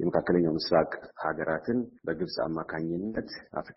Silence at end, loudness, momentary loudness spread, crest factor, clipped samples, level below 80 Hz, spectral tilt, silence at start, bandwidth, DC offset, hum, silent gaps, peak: 0.05 s; -30 LUFS; 9 LU; 18 dB; under 0.1%; -58 dBFS; -5 dB/octave; 0 s; 6 kHz; under 0.1%; none; none; -12 dBFS